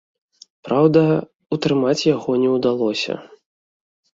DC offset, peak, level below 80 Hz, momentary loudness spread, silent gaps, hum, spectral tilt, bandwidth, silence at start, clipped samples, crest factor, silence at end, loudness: under 0.1%; -2 dBFS; -60 dBFS; 10 LU; 1.35-1.39 s; none; -6.5 dB/octave; 7.8 kHz; 0.65 s; under 0.1%; 18 dB; 0.95 s; -19 LUFS